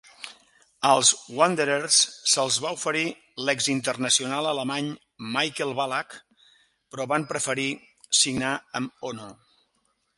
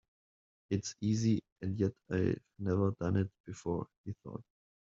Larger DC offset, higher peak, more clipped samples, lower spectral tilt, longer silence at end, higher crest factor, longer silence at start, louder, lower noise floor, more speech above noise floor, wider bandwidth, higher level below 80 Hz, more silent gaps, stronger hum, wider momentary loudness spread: neither; first, -4 dBFS vs -18 dBFS; neither; second, -1.5 dB/octave vs -8 dB/octave; first, 0.85 s vs 0.4 s; about the same, 22 dB vs 18 dB; second, 0.2 s vs 0.7 s; first, -24 LUFS vs -35 LUFS; second, -72 dBFS vs under -90 dBFS; second, 46 dB vs over 55 dB; first, 11.5 kHz vs 7.8 kHz; about the same, -68 dBFS vs -66 dBFS; second, none vs 1.52-1.56 s, 3.40-3.44 s, 3.97-4.04 s; neither; first, 17 LU vs 13 LU